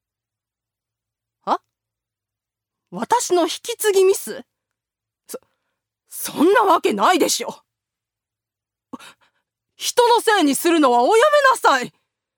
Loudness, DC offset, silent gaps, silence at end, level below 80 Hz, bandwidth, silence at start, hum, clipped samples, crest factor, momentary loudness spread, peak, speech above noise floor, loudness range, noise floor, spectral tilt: -17 LUFS; under 0.1%; none; 0.5 s; -76 dBFS; over 20 kHz; 1.45 s; none; under 0.1%; 18 dB; 20 LU; -2 dBFS; 71 dB; 7 LU; -87 dBFS; -2 dB/octave